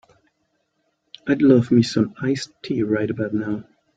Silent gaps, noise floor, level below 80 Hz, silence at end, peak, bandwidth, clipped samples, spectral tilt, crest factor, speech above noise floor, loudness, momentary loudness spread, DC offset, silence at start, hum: none; -71 dBFS; -58 dBFS; 0.35 s; -2 dBFS; 9 kHz; under 0.1%; -7 dB/octave; 20 dB; 51 dB; -20 LUFS; 12 LU; under 0.1%; 1.25 s; none